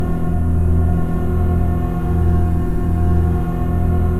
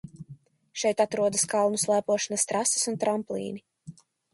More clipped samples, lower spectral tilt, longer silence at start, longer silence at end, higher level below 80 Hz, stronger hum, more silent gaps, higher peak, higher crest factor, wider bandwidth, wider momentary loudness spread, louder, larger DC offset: neither; first, -10 dB/octave vs -3 dB/octave; about the same, 0 s vs 0.05 s; second, 0 s vs 0.45 s; first, -22 dBFS vs -70 dBFS; neither; neither; first, -4 dBFS vs -10 dBFS; second, 10 dB vs 18 dB; about the same, 12.5 kHz vs 12 kHz; second, 3 LU vs 13 LU; first, -18 LUFS vs -26 LUFS; first, 3% vs under 0.1%